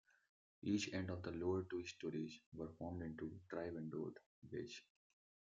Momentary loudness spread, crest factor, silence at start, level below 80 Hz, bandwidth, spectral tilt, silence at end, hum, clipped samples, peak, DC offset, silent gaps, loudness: 10 LU; 18 dB; 0.65 s; -76 dBFS; 7.6 kHz; -5.5 dB/octave; 0.75 s; none; under 0.1%; -28 dBFS; under 0.1%; 2.46-2.52 s, 4.26-4.42 s; -47 LUFS